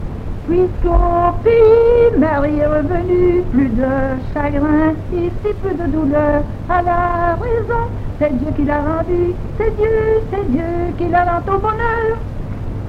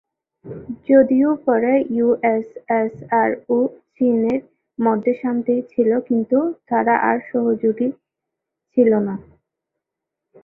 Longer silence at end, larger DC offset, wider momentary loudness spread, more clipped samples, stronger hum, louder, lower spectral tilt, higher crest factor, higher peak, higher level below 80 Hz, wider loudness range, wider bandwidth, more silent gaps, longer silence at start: second, 0 s vs 1.2 s; neither; about the same, 8 LU vs 9 LU; neither; neither; first, -16 LUFS vs -19 LUFS; about the same, -9.5 dB/octave vs -10.5 dB/octave; about the same, 14 dB vs 16 dB; about the same, 0 dBFS vs -2 dBFS; first, -24 dBFS vs -62 dBFS; about the same, 4 LU vs 2 LU; first, 6.4 kHz vs 3.3 kHz; neither; second, 0 s vs 0.45 s